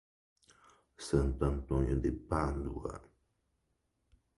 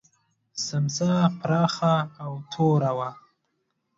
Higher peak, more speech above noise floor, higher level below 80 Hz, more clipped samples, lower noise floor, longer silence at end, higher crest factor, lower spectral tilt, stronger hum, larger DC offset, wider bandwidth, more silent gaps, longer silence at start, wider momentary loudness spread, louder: second, -16 dBFS vs -8 dBFS; second, 47 dB vs 51 dB; first, -42 dBFS vs -66 dBFS; neither; first, -80 dBFS vs -75 dBFS; first, 1.4 s vs 0.85 s; about the same, 20 dB vs 18 dB; first, -7.5 dB/octave vs -6 dB/octave; neither; neither; first, 11.5 kHz vs 7.8 kHz; neither; first, 1 s vs 0.55 s; about the same, 13 LU vs 13 LU; second, -35 LUFS vs -25 LUFS